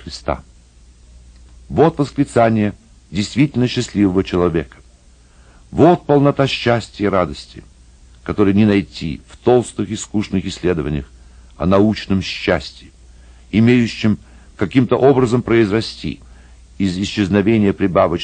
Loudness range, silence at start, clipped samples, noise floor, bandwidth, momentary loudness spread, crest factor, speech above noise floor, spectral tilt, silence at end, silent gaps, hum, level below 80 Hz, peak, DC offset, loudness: 3 LU; 0.05 s; under 0.1%; -47 dBFS; 9.8 kHz; 13 LU; 16 dB; 31 dB; -6.5 dB/octave; 0 s; none; none; -40 dBFS; 0 dBFS; under 0.1%; -17 LUFS